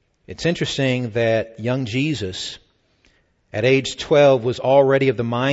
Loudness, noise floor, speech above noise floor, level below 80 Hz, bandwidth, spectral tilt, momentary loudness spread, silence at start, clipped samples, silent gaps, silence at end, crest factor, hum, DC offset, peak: -19 LUFS; -60 dBFS; 42 dB; -52 dBFS; 8 kHz; -5.5 dB/octave; 13 LU; 0.3 s; under 0.1%; none; 0 s; 16 dB; none; under 0.1%; -2 dBFS